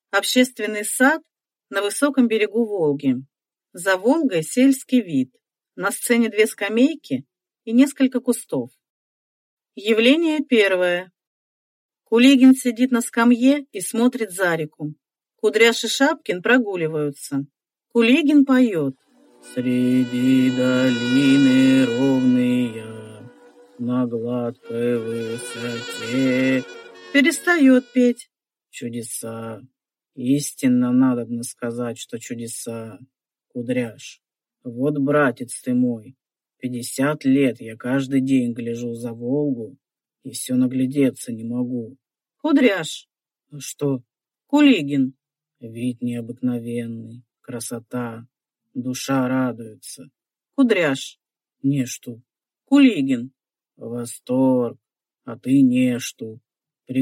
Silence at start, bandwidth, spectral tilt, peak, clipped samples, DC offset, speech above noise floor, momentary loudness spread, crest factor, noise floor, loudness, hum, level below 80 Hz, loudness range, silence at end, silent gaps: 0.15 s; 16 kHz; -5 dB/octave; -2 dBFS; under 0.1%; under 0.1%; 29 dB; 17 LU; 18 dB; -49 dBFS; -20 LUFS; none; -72 dBFS; 7 LU; 0 s; 8.90-9.57 s, 11.27-11.89 s